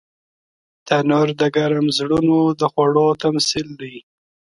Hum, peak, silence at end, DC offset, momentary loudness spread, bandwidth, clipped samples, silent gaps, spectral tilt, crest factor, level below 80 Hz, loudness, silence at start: none; -2 dBFS; 0.5 s; under 0.1%; 8 LU; 11.5 kHz; under 0.1%; none; -5 dB/octave; 16 dB; -54 dBFS; -17 LUFS; 0.85 s